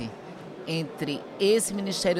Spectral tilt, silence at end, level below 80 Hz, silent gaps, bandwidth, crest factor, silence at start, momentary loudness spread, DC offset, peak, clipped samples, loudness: -4 dB/octave; 0 s; -62 dBFS; none; 16 kHz; 16 dB; 0 s; 17 LU; under 0.1%; -12 dBFS; under 0.1%; -27 LUFS